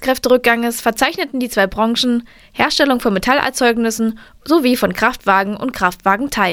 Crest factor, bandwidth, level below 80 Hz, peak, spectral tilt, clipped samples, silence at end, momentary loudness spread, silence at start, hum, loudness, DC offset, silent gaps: 16 dB; over 20 kHz; -42 dBFS; 0 dBFS; -3.5 dB/octave; under 0.1%; 0 s; 7 LU; 0 s; none; -16 LUFS; under 0.1%; none